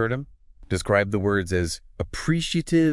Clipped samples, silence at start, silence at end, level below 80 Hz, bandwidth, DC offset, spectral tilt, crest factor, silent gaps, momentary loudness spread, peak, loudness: under 0.1%; 0 s; 0 s; -44 dBFS; 12 kHz; under 0.1%; -5.5 dB/octave; 18 dB; none; 10 LU; -4 dBFS; -25 LUFS